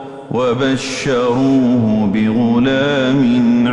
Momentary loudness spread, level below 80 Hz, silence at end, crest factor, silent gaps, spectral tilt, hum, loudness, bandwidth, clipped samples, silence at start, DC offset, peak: 5 LU; -46 dBFS; 0 s; 10 dB; none; -6 dB/octave; none; -14 LUFS; 10.5 kHz; under 0.1%; 0 s; under 0.1%; -4 dBFS